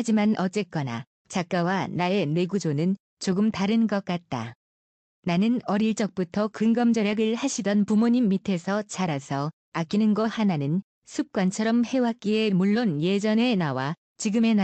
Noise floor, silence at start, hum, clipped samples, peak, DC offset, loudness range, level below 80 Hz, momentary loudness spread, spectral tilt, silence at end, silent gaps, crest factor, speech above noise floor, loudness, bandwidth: under -90 dBFS; 0 s; none; under 0.1%; -12 dBFS; under 0.1%; 3 LU; -68 dBFS; 8 LU; -6 dB/octave; 0 s; 1.07-1.25 s, 3.00-3.17 s, 4.55-5.23 s, 9.53-9.72 s, 10.84-11.02 s, 13.97-14.15 s; 12 dB; over 66 dB; -25 LUFS; 8.8 kHz